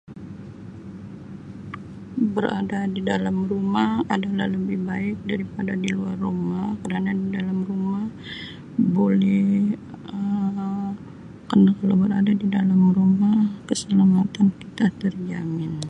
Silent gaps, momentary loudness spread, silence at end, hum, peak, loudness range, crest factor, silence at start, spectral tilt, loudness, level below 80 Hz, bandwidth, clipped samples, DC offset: none; 20 LU; 0 s; none; -6 dBFS; 6 LU; 16 dB; 0.1 s; -7.5 dB/octave; -22 LUFS; -54 dBFS; 9.8 kHz; under 0.1%; under 0.1%